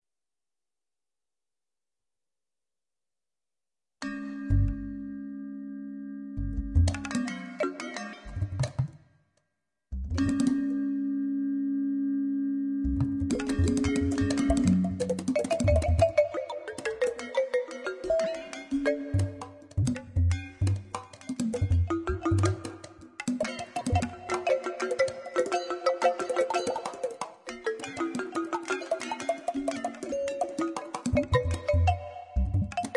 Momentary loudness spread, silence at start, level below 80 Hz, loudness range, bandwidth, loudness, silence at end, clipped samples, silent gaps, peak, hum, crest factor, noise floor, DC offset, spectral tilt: 12 LU; 4 s; -42 dBFS; 8 LU; 11.5 kHz; -30 LUFS; 0 s; under 0.1%; none; -10 dBFS; none; 20 dB; under -90 dBFS; under 0.1%; -6.5 dB/octave